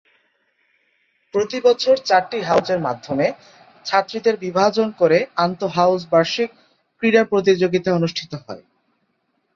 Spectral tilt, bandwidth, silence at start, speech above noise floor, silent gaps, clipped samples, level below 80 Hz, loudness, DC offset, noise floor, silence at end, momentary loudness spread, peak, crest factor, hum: -5.5 dB/octave; 7.4 kHz; 1.35 s; 51 dB; none; under 0.1%; -62 dBFS; -19 LUFS; under 0.1%; -69 dBFS; 0.95 s; 10 LU; -2 dBFS; 18 dB; none